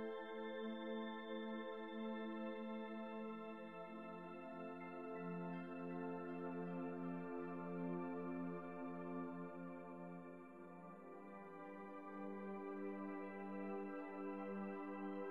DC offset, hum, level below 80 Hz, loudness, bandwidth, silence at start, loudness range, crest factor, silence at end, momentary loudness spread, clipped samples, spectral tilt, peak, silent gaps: under 0.1%; none; under -90 dBFS; -50 LUFS; 10 kHz; 0 s; 5 LU; 14 dB; 0 s; 7 LU; under 0.1%; -8.5 dB/octave; -36 dBFS; none